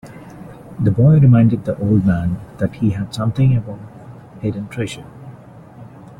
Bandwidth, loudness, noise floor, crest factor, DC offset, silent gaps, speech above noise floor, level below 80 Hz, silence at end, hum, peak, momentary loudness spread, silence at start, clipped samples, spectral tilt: 11 kHz; -17 LUFS; -39 dBFS; 14 dB; under 0.1%; none; 24 dB; -42 dBFS; 0.05 s; none; -2 dBFS; 26 LU; 0.05 s; under 0.1%; -9 dB/octave